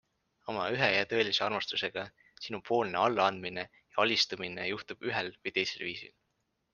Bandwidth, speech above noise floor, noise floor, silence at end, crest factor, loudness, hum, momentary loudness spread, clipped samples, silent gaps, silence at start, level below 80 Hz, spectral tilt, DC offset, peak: 9.8 kHz; 47 dB; -80 dBFS; 0.65 s; 24 dB; -31 LUFS; none; 14 LU; under 0.1%; none; 0.45 s; -72 dBFS; -3.5 dB/octave; under 0.1%; -10 dBFS